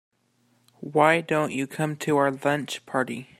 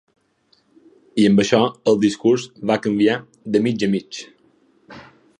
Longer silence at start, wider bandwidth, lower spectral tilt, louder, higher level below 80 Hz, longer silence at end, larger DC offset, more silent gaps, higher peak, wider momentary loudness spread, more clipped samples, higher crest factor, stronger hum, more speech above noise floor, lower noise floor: second, 0.8 s vs 1.15 s; first, 16 kHz vs 10 kHz; about the same, -5.5 dB/octave vs -5.5 dB/octave; second, -24 LUFS vs -19 LUFS; second, -70 dBFS vs -60 dBFS; second, 0.15 s vs 0.35 s; neither; neither; second, -4 dBFS vs 0 dBFS; about the same, 9 LU vs 11 LU; neither; about the same, 22 dB vs 20 dB; neither; about the same, 42 dB vs 44 dB; first, -67 dBFS vs -62 dBFS